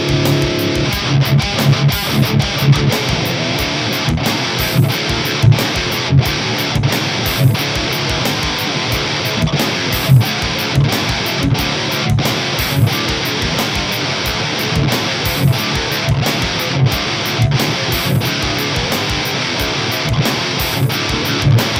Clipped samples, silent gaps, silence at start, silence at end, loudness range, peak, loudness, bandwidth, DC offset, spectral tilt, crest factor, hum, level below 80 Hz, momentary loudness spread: under 0.1%; none; 0 s; 0 s; 2 LU; 0 dBFS; -15 LUFS; 16.5 kHz; under 0.1%; -4.5 dB/octave; 16 dB; none; -32 dBFS; 3 LU